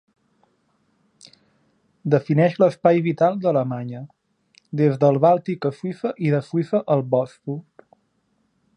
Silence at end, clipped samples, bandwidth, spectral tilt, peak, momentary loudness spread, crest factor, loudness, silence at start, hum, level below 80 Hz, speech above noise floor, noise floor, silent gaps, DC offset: 1.15 s; under 0.1%; 9.8 kHz; -9 dB/octave; -4 dBFS; 15 LU; 18 dB; -21 LUFS; 2.05 s; none; -70 dBFS; 48 dB; -68 dBFS; none; under 0.1%